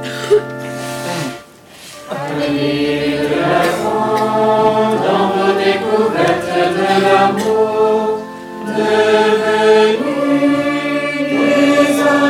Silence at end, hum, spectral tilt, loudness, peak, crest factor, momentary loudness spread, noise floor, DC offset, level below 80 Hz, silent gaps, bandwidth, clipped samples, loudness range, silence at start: 0 s; none; -5 dB/octave; -14 LUFS; -2 dBFS; 12 dB; 12 LU; -38 dBFS; under 0.1%; -54 dBFS; none; 16.5 kHz; under 0.1%; 5 LU; 0 s